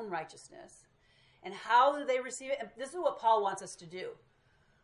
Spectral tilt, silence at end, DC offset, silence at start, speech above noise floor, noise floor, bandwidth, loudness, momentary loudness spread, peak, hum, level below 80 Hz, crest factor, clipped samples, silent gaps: -2.5 dB/octave; 0.7 s; under 0.1%; 0 s; 36 dB; -69 dBFS; 11.5 kHz; -32 LUFS; 22 LU; -14 dBFS; none; -76 dBFS; 20 dB; under 0.1%; none